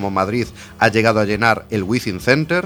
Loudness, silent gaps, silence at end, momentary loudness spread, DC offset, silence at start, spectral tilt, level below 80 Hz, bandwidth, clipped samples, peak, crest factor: -17 LUFS; none; 0 s; 6 LU; under 0.1%; 0 s; -5.5 dB/octave; -44 dBFS; 19 kHz; under 0.1%; 0 dBFS; 18 dB